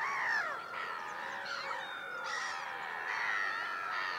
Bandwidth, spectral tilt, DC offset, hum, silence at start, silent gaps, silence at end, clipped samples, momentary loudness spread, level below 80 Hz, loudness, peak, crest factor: 16 kHz; -1 dB/octave; under 0.1%; none; 0 s; none; 0 s; under 0.1%; 7 LU; -84 dBFS; -37 LUFS; -22 dBFS; 16 dB